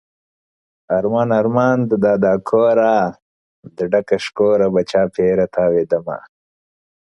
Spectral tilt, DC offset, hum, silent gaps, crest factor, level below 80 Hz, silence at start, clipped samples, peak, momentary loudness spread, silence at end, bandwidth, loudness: -7.5 dB/octave; under 0.1%; none; 3.22-3.63 s; 16 dB; -54 dBFS; 0.9 s; under 0.1%; -2 dBFS; 7 LU; 1 s; 11 kHz; -16 LUFS